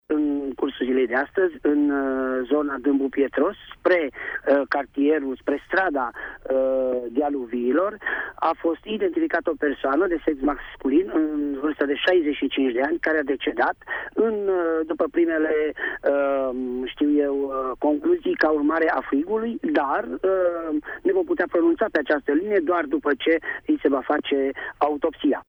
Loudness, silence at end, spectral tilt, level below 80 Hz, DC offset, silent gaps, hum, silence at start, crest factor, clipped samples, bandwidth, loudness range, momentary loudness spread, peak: -23 LUFS; 0.05 s; -7 dB/octave; -54 dBFS; under 0.1%; none; none; 0.1 s; 14 dB; under 0.1%; over 20 kHz; 1 LU; 5 LU; -8 dBFS